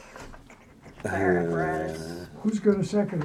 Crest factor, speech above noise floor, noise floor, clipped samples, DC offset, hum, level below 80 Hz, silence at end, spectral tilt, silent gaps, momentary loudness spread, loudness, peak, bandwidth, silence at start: 18 dB; 25 dB; -50 dBFS; under 0.1%; under 0.1%; none; -52 dBFS; 0 s; -7 dB/octave; none; 18 LU; -27 LUFS; -10 dBFS; 13.5 kHz; 0 s